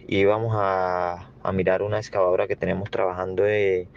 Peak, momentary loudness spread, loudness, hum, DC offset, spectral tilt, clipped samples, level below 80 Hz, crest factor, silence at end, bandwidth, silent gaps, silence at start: -6 dBFS; 6 LU; -24 LUFS; none; under 0.1%; -7 dB/octave; under 0.1%; -58 dBFS; 16 dB; 0.1 s; 7.4 kHz; none; 0 s